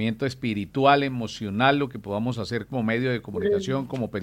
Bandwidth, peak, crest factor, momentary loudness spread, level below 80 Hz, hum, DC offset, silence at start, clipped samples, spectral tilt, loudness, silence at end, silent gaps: 15.5 kHz; -4 dBFS; 20 dB; 9 LU; -58 dBFS; none; under 0.1%; 0 s; under 0.1%; -6.5 dB/octave; -25 LUFS; 0 s; none